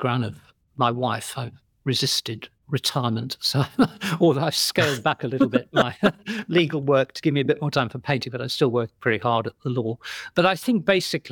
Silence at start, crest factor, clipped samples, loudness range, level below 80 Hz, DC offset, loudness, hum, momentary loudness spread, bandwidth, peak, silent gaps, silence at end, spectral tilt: 0 s; 18 dB; under 0.1%; 3 LU; -62 dBFS; under 0.1%; -23 LUFS; none; 9 LU; 19.5 kHz; -6 dBFS; none; 0 s; -5 dB/octave